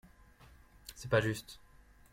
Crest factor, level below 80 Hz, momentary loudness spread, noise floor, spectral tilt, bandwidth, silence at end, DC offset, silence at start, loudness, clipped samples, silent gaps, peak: 22 dB; -60 dBFS; 22 LU; -60 dBFS; -5.5 dB/octave; 16.5 kHz; 0.55 s; under 0.1%; 0.85 s; -34 LUFS; under 0.1%; none; -16 dBFS